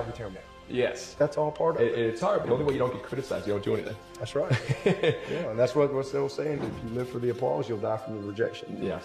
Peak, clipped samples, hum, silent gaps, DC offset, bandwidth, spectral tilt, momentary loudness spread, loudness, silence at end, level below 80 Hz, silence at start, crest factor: -12 dBFS; under 0.1%; none; none; under 0.1%; 13.5 kHz; -6.5 dB/octave; 9 LU; -29 LUFS; 0 s; -56 dBFS; 0 s; 18 dB